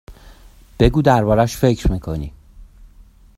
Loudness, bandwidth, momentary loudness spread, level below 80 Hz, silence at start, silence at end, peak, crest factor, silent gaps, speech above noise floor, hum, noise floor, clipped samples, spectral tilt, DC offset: -17 LUFS; 16 kHz; 14 LU; -28 dBFS; 0.1 s; 0.75 s; 0 dBFS; 18 dB; none; 30 dB; none; -46 dBFS; under 0.1%; -7 dB/octave; under 0.1%